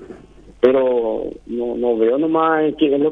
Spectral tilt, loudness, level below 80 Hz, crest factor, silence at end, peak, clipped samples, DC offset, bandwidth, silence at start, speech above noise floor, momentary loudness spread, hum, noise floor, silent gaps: -8 dB/octave; -18 LUFS; -48 dBFS; 18 dB; 0 s; 0 dBFS; under 0.1%; under 0.1%; 4.3 kHz; 0 s; 26 dB; 9 LU; none; -43 dBFS; none